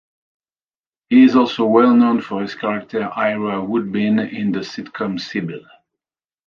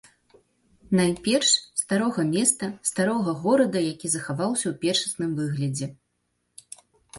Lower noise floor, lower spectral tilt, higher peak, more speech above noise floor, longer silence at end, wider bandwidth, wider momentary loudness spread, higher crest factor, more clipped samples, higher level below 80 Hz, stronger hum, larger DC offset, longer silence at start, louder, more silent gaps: first, under -90 dBFS vs -75 dBFS; first, -7 dB/octave vs -4 dB/octave; first, -2 dBFS vs -6 dBFS; first, over 73 dB vs 51 dB; first, 0.9 s vs 0 s; second, 6.8 kHz vs 12 kHz; first, 13 LU vs 7 LU; about the same, 16 dB vs 20 dB; neither; about the same, -62 dBFS vs -62 dBFS; second, none vs 60 Hz at -50 dBFS; neither; first, 1.1 s vs 0.9 s; first, -17 LUFS vs -24 LUFS; neither